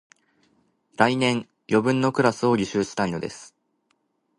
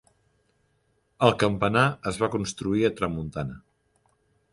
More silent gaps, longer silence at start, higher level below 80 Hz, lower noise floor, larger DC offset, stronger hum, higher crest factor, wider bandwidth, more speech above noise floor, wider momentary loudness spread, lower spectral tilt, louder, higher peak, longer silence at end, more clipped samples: neither; second, 1 s vs 1.2 s; second, -60 dBFS vs -52 dBFS; about the same, -71 dBFS vs -70 dBFS; neither; neither; about the same, 24 dB vs 24 dB; about the same, 11.5 kHz vs 11.5 kHz; first, 49 dB vs 45 dB; about the same, 13 LU vs 11 LU; about the same, -5.5 dB/octave vs -5.5 dB/octave; about the same, -23 LUFS vs -25 LUFS; about the same, -2 dBFS vs -4 dBFS; about the same, 0.9 s vs 0.95 s; neither